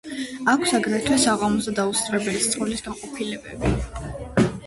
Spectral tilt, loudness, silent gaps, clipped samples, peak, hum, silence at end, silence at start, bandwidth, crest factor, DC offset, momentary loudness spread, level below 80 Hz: -4 dB/octave; -23 LUFS; none; under 0.1%; -6 dBFS; none; 0 s; 0.05 s; 12 kHz; 18 dB; under 0.1%; 11 LU; -40 dBFS